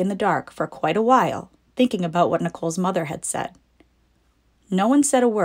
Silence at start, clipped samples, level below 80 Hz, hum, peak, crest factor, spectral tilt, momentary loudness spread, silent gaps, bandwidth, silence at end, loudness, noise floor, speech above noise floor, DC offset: 0 s; under 0.1%; -60 dBFS; none; -4 dBFS; 18 dB; -5 dB/octave; 11 LU; none; 16 kHz; 0 s; -21 LUFS; -62 dBFS; 42 dB; under 0.1%